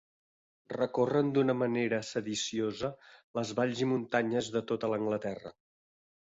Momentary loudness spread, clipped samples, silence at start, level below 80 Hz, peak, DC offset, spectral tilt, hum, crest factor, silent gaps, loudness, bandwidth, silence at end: 10 LU; under 0.1%; 0.7 s; -70 dBFS; -16 dBFS; under 0.1%; -5 dB/octave; none; 18 dB; 3.24-3.34 s; -32 LUFS; 8 kHz; 0.8 s